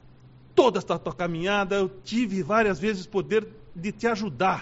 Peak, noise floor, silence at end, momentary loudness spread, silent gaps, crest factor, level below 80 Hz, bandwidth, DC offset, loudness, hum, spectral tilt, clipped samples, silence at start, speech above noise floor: -6 dBFS; -51 dBFS; 0 s; 8 LU; none; 20 dB; -54 dBFS; 8 kHz; under 0.1%; -26 LUFS; none; -4 dB/octave; under 0.1%; 0.55 s; 25 dB